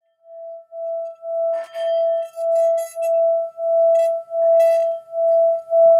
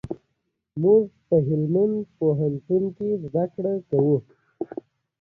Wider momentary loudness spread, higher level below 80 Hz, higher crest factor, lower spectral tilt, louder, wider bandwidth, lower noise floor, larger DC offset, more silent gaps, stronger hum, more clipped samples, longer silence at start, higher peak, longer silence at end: second, 13 LU vs 16 LU; second, -82 dBFS vs -60 dBFS; about the same, 12 dB vs 16 dB; second, -1.5 dB/octave vs -13 dB/octave; first, -19 LUFS vs -23 LUFS; first, 12 kHz vs 2.4 kHz; second, -39 dBFS vs -76 dBFS; neither; neither; neither; neither; first, 0.3 s vs 0.05 s; about the same, -6 dBFS vs -8 dBFS; second, 0 s vs 0.55 s